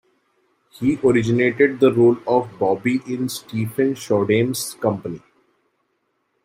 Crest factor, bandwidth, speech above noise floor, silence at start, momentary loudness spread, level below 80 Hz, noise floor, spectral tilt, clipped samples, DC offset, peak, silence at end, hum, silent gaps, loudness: 18 dB; 16 kHz; 51 dB; 0.8 s; 10 LU; -58 dBFS; -70 dBFS; -6 dB/octave; under 0.1%; under 0.1%; -2 dBFS; 1.25 s; none; none; -19 LUFS